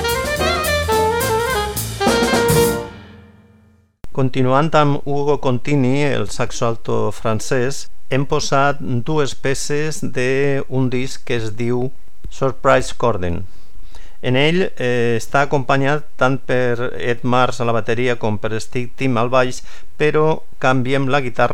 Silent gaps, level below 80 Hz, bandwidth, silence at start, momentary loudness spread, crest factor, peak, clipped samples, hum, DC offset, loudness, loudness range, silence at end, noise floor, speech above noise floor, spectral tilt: none; -38 dBFS; 18 kHz; 0 s; 8 LU; 18 dB; 0 dBFS; under 0.1%; none; 10%; -18 LUFS; 2 LU; 0 s; -52 dBFS; 34 dB; -5 dB/octave